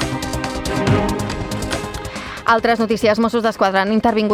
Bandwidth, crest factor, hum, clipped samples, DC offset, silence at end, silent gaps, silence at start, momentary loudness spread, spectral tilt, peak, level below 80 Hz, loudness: 15.5 kHz; 16 dB; none; under 0.1%; under 0.1%; 0 s; none; 0 s; 9 LU; -5.5 dB/octave; -2 dBFS; -34 dBFS; -18 LUFS